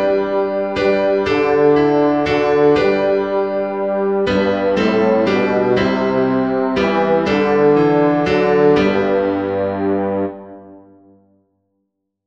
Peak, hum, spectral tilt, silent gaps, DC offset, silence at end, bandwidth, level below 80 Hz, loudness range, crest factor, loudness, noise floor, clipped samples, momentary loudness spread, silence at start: -2 dBFS; none; -7.5 dB/octave; none; 0.3%; 1.5 s; 7.6 kHz; -46 dBFS; 3 LU; 14 dB; -15 LUFS; -72 dBFS; under 0.1%; 6 LU; 0 s